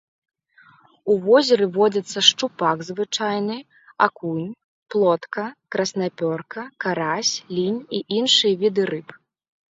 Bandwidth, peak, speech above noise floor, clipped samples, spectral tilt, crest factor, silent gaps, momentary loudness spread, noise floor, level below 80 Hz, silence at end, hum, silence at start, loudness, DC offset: 7.8 kHz; 0 dBFS; 33 dB; under 0.1%; -3.5 dB/octave; 22 dB; 4.64-4.82 s; 13 LU; -54 dBFS; -70 dBFS; 0.6 s; none; 1.05 s; -21 LUFS; under 0.1%